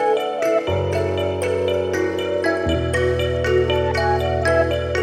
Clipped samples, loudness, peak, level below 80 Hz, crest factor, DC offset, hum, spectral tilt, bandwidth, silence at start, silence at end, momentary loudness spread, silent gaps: under 0.1%; -20 LUFS; -6 dBFS; -34 dBFS; 14 dB; under 0.1%; none; -6 dB/octave; 14.5 kHz; 0 s; 0 s; 3 LU; none